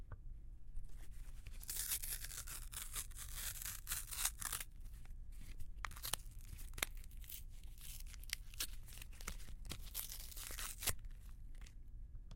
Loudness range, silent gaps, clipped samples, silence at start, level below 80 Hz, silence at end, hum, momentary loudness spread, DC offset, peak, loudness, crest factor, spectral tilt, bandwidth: 5 LU; none; under 0.1%; 0 s; -52 dBFS; 0 s; none; 17 LU; under 0.1%; -16 dBFS; -46 LUFS; 30 dB; -1 dB/octave; 17 kHz